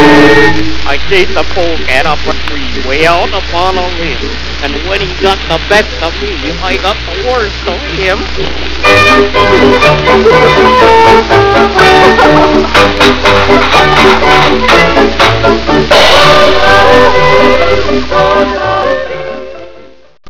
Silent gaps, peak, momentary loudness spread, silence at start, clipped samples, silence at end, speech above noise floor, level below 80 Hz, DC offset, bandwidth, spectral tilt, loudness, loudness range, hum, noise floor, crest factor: none; 0 dBFS; 11 LU; 0 s; 4%; 0 s; 27 dB; -22 dBFS; under 0.1%; 6 kHz; -4.5 dB/octave; -7 LUFS; 7 LU; none; -34 dBFS; 8 dB